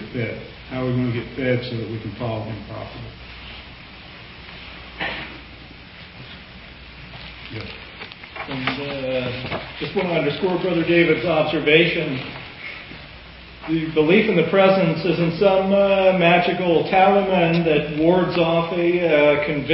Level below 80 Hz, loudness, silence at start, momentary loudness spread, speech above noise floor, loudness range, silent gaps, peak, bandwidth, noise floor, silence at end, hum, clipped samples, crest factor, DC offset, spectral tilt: -46 dBFS; -19 LUFS; 0 s; 23 LU; 22 dB; 17 LU; none; -2 dBFS; 5.8 kHz; -41 dBFS; 0 s; none; under 0.1%; 20 dB; under 0.1%; -11 dB/octave